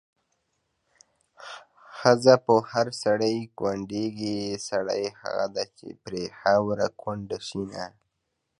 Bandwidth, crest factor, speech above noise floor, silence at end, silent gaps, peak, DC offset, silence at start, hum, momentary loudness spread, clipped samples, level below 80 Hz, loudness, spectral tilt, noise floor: 11.5 kHz; 24 dB; 54 dB; 0.7 s; none; -2 dBFS; under 0.1%; 1.4 s; none; 21 LU; under 0.1%; -64 dBFS; -26 LUFS; -5 dB/octave; -79 dBFS